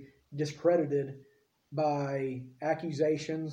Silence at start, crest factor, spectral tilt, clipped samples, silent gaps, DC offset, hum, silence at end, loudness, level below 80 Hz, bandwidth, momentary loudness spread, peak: 0 s; 18 dB; -7 dB/octave; under 0.1%; none; under 0.1%; none; 0 s; -32 LUFS; -74 dBFS; 10 kHz; 13 LU; -14 dBFS